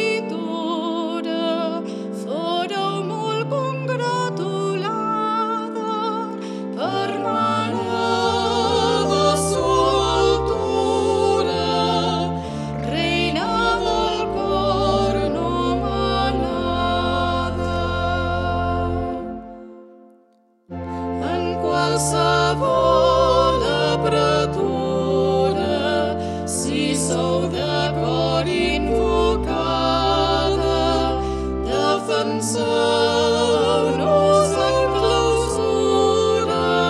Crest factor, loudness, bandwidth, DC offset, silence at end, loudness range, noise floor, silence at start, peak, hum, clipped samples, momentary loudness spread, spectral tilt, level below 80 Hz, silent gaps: 16 dB; -20 LUFS; 13 kHz; under 0.1%; 0 s; 6 LU; -58 dBFS; 0 s; -4 dBFS; none; under 0.1%; 7 LU; -5 dB/octave; -36 dBFS; none